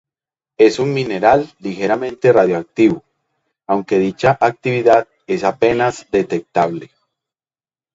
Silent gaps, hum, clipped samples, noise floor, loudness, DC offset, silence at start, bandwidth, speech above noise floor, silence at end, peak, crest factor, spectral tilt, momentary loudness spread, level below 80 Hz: none; none; under 0.1%; under -90 dBFS; -16 LUFS; under 0.1%; 0.6 s; 8 kHz; over 75 dB; 1.1 s; 0 dBFS; 16 dB; -6.5 dB/octave; 8 LU; -52 dBFS